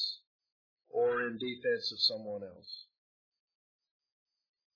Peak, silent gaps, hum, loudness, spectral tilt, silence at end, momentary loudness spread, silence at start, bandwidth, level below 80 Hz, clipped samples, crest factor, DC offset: -16 dBFS; 0.27-0.39 s, 0.52-0.77 s; none; -33 LUFS; -0.5 dB/octave; 1.9 s; 17 LU; 0 s; 5.4 kHz; -84 dBFS; under 0.1%; 22 dB; under 0.1%